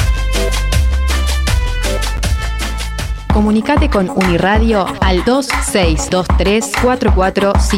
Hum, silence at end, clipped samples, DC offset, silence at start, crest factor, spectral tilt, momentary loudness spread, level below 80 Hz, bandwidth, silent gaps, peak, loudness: none; 0 s; under 0.1%; under 0.1%; 0 s; 12 dB; -5 dB/octave; 5 LU; -16 dBFS; 15.5 kHz; none; -2 dBFS; -14 LUFS